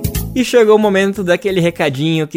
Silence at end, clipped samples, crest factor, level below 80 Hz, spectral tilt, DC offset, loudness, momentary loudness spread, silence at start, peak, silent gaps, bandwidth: 0 s; under 0.1%; 14 dB; -32 dBFS; -5.5 dB/octave; under 0.1%; -13 LUFS; 7 LU; 0 s; 0 dBFS; none; 16.5 kHz